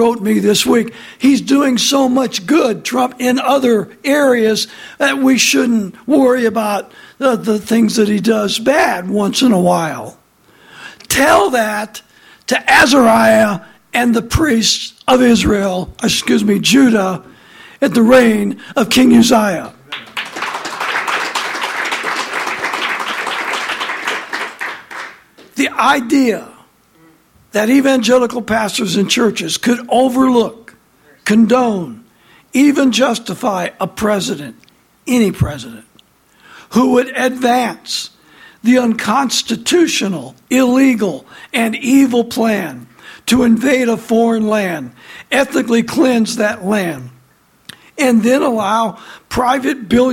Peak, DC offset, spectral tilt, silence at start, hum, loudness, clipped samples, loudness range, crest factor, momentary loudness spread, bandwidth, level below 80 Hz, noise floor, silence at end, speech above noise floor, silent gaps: 0 dBFS; under 0.1%; -4 dB/octave; 0 s; none; -14 LUFS; under 0.1%; 6 LU; 14 dB; 12 LU; 16.5 kHz; -42 dBFS; -52 dBFS; 0 s; 39 dB; none